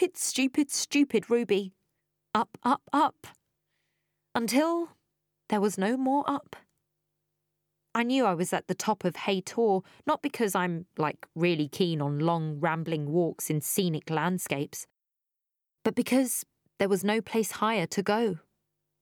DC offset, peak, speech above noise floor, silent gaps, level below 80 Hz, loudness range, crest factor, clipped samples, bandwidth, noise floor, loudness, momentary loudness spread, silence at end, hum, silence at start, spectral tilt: under 0.1%; -10 dBFS; 59 dB; none; -76 dBFS; 2 LU; 20 dB; under 0.1%; 19.5 kHz; -87 dBFS; -28 LUFS; 6 LU; 0.65 s; 50 Hz at -60 dBFS; 0 s; -4.5 dB/octave